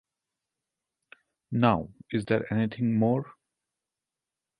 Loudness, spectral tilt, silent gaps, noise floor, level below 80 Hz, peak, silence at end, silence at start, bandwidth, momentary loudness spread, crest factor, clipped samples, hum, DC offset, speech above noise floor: -27 LUFS; -8.5 dB/octave; none; -89 dBFS; -60 dBFS; -8 dBFS; 1.3 s; 1.5 s; 10 kHz; 9 LU; 22 dB; under 0.1%; none; under 0.1%; 63 dB